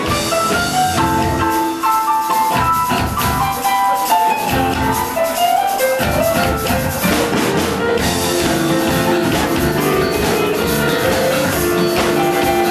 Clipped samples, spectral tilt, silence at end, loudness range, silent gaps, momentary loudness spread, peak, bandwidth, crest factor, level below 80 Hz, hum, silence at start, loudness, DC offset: under 0.1%; -4 dB/octave; 0 s; 0 LU; none; 2 LU; -2 dBFS; 13.5 kHz; 12 dB; -34 dBFS; none; 0 s; -15 LUFS; under 0.1%